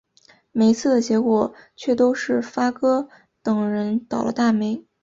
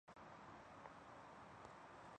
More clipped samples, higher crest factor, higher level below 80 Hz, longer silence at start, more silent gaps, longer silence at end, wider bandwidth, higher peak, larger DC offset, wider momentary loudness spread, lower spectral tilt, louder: neither; about the same, 16 dB vs 18 dB; first, -62 dBFS vs -80 dBFS; first, 0.55 s vs 0.05 s; neither; first, 0.25 s vs 0 s; second, 7.8 kHz vs 9.4 kHz; first, -4 dBFS vs -42 dBFS; neither; first, 9 LU vs 1 LU; about the same, -6 dB/octave vs -5 dB/octave; first, -21 LUFS vs -60 LUFS